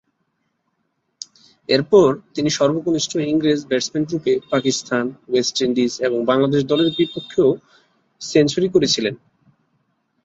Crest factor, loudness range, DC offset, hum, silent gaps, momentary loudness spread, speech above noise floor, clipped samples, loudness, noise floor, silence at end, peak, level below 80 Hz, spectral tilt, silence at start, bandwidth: 18 dB; 2 LU; under 0.1%; none; none; 10 LU; 53 dB; under 0.1%; -19 LUFS; -71 dBFS; 1.1 s; -2 dBFS; -58 dBFS; -4.5 dB/octave; 1.7 s; 8 kHz